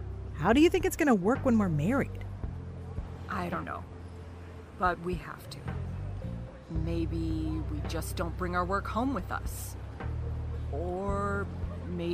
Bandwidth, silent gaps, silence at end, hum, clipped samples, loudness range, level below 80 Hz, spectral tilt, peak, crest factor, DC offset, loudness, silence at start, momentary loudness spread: 15.5 kHz; none; 0 s; none; under 0.1%; 8 LU; -42 dBFS; -6.5 dB/octave; -10 dBFS; 20 dB; under 0.1%; -32 LUFS; 0 s; 15 LU